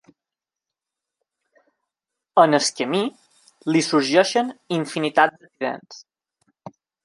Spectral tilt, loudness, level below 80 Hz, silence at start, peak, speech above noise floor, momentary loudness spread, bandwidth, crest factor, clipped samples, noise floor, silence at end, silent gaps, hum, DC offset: -4 dB/octave; -20 LUFS; -74 dBFS; 2.35 s; -2 dBFS; 68 dB; 12 LU; 11.5 kHz; 22 dB; under 0.1%; -88 dBFS; 0.35 s; none; none; under 0.1%